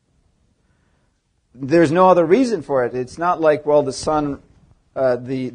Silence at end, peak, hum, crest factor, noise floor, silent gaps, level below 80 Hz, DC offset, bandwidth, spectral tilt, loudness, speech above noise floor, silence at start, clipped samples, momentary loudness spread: 0 s; 0 dBFS; none; 18 dB; -65 dBFS; none; -50 dBFS; under 0.1%; 10 kHz; -6.5 dB/octave; -17 LUFS; 48 dB; 1.6 s; under 0.1%; 12 LU